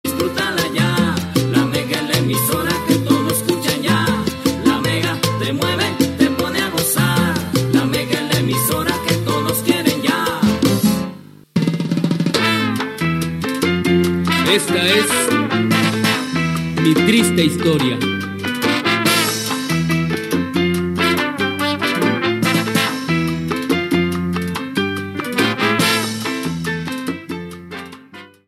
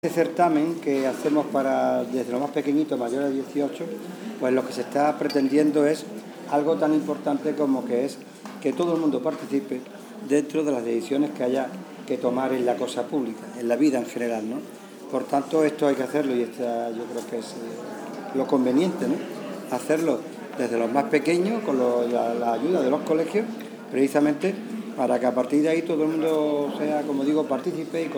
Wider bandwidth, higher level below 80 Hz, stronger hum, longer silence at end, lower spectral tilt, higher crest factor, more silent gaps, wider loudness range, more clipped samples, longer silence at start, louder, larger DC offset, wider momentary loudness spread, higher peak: second, 16.5 kHz vs over 20 kHz; first, -46 dBFS vs -88 dBFS; neither; first, 0.2 s vs 0 s; second, -4.5 dB/octave vs -6 dB/octave; about the same, 16 dB vs 18 dB; neither; about the same, 3 LU vs 3 LU; neither; about the same, 0.05 s vs 0.05 s; first, -17 LUFS vs -25 LUFS; neither; second, 7 LU vs 11 LU; first, 0 dBFS vs -6 dBFS